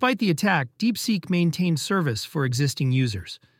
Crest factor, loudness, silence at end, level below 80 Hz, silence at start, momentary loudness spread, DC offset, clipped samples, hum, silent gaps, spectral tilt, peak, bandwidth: 16 dB; -24 LUFS; 0.25 s; -58 dBFS; 0 s; 4 LU; under 0.1%; under 0.1%; none; none; -5.5 dB/octave; -6 dBFS; 16.5 kHz